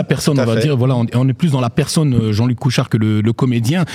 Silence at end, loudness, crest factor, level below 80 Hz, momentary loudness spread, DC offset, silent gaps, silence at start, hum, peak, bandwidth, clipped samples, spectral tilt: 0 s; -15 LUFS; 14 dB; -46 dBFS; 2 LU; under 0.1%; none; 0 s; none; 0 dBFS; 15 kHz; under 0.1%; -6.5 dB/octave